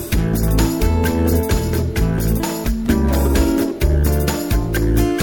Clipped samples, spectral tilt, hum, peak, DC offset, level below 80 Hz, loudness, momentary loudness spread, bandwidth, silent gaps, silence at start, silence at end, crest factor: under 0.1%; -6 dB/octave; none; -2 dBFS; 0.4%; -20 dBFS; -18 LUFS; 3 LU; 17.5 kHz; none; 0 s; 0 s; 14 dB